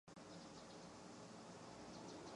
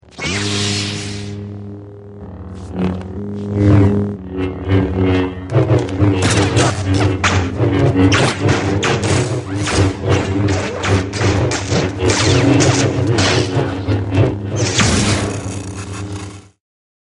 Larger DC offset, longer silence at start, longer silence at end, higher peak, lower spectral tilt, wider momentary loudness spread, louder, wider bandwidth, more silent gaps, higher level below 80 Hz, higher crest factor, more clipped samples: neither; about the same, 0.05 s vs 0.15 s; second, 0 s vs 0.6 s; second, -44 dBFS vs 0 dBFS; about the same, -4 dB/octave vs -5 dB/octave; second, 3 LU vs 14 LU; second, -57 LUFS vs -16 LUFS; about the same, 11 kHz vs 11.5 kHz; neither; second, -78 dBFS vs -34 dBFS; about the same, 14 dB vs 16 dB; neither